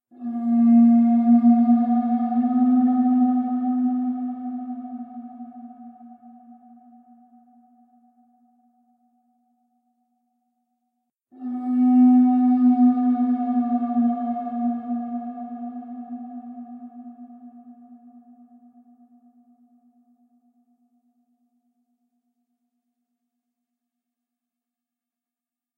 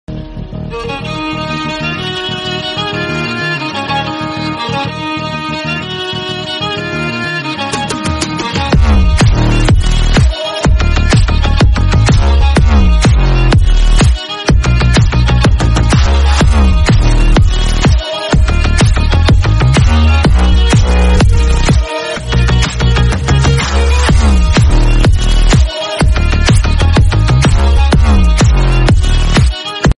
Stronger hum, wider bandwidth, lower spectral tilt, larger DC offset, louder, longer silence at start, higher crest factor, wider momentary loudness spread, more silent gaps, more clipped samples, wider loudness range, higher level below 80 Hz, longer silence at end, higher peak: neither; second, 2.3 kHz vs 11.5 kHz; first, -11 dB/octave vs -5.5 dB/octave; neither; second, -20 LUFS vs -11 LUFS; about the same, 0.2 s vs 0.1 s; first, 16 dB vs 10 dB; first, 23 LU vs 8 LU; neither; neither; first, 22 LU vs 6 LU; second, -86 dBFS vs -12 dBFS; first, 7.8 s vs 0.05 s; second, -8 dBFS vs 0 dBFS